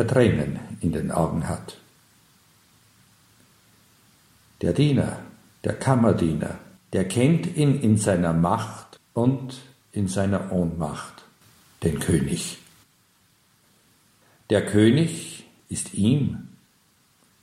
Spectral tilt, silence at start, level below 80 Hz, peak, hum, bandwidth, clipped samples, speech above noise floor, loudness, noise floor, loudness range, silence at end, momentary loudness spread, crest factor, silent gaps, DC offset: -6.5 dB/octave; 0 s; -48 dBFS; -4 dBFS; none; 15 kHz; under 0.1%; 40 dB; -24 LUFS; -62 dBFS; 8 LU; 0.95 s; 16 LU; 20 dB; none; under 0.1%